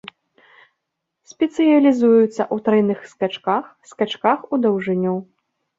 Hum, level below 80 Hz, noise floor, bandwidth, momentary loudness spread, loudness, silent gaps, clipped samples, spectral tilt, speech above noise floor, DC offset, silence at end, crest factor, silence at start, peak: none; -66 dBFS; -78 dBFS; 7.8 kHz; 10 LU; -19 LUFS; none; under 0.1%; -7 dB/octave; 60 dB; under 0.1%; 0.55 s; 16 dB; 1.4 s; -2 dBFS